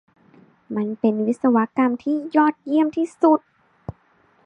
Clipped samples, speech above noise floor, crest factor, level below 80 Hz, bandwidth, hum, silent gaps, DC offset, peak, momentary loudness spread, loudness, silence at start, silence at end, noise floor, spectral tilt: under 0.1%; 40 dB; 16 dB; -58 dBFS; 9.2 kHz; none; none; under 0.1%; -4 dBFS; 18 LU; -20 LUFS; 0.7 s; 0.55 s; -59 dBFS; -7.5 dB/octave